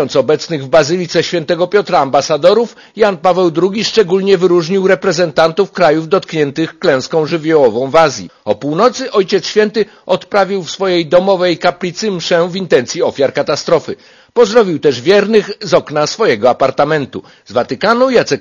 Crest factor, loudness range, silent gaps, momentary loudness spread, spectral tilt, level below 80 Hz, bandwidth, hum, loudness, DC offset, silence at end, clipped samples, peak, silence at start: 12 dB; 2 LU; none; 6 LU; -5 dB/octave; -52 dBFS; 7.4 kHz; none; -12 LUFS; under 0.1%; 0 s; 0.3%; 0 dBFS; 0 s